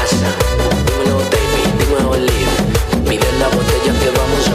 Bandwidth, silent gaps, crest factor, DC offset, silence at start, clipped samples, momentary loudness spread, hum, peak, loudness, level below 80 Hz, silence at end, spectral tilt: 15.5 kHz; none; 12 dB; under 0.1%; 0 s; under 0.1%; 1 LU; none; -2 dBFS; -14 LUFS; -20 dBFS; 0 s; -5 dB/octave